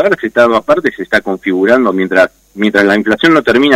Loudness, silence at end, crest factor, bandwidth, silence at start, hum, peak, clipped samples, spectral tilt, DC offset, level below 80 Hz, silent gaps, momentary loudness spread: -11 LUFS; 0 s; 10 dB; 15.5 kHz; 0 s; none; 0 dBFS; 0.4%; -5.5 dB/octave; under 0.1%; -48 dBFS; none; 5 LU